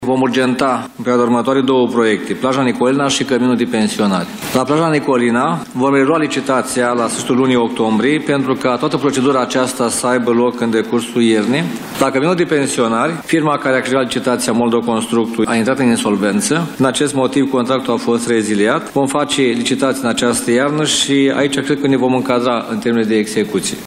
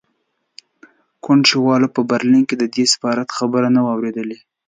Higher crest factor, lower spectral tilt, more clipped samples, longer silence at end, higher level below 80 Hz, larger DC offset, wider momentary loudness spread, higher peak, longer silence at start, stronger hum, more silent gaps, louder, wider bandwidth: second, 12 dB vs 18 dB; about the same, -4.5 dB/octave vs -4 dB/octave; neither; second, 0 s vs 0.35 s; first, -54 dBFS vs -68 dBFS; neither; second, 3 LU vs 10 LU; about the same, -2 dBFS vs 0 dBFS; second, 0 s vs 1.25 s; neither; neither; about the same, -15 LUFS vs -16 LUFS; first, 16 kHz vs 9.4 kHz